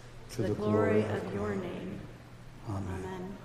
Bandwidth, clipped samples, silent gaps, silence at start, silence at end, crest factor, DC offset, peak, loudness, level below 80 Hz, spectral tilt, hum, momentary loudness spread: 14.5 kHz; under 0.1%; none; 0 s; 0 s; 18 dB; under 0.1%; -16 dBFS; -33 LUFS; -54 dBFS; -7.5 dB/octave; none; 19 LU